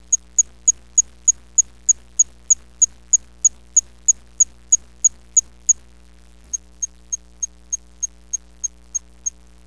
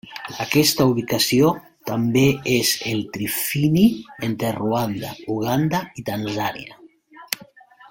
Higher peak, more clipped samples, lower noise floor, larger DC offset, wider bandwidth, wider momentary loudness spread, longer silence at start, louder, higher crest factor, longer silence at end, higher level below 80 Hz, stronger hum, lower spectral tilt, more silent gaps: second, -4 dBFS vs 0 dBFS; neither; about the same, -48 dBFS vs -47 dBFS; first, 0.5% vs under 0.1%; second, 11 kHz vs 17 kHz; about the same, 13 LU vs 13 LU; about the same, 0.1 s vs 0.05 s; first, -18 LUFS vs -21 LUFS; about the same, 18 dB vs 22 dB; first, 0.4 s vs 0.05 s; first, -48 dBFS vs -54 dBFS; first, 60 Hz at -50 dBFS vs none; second, 0.5 dB/octave vs -4.5 dB/octave; neither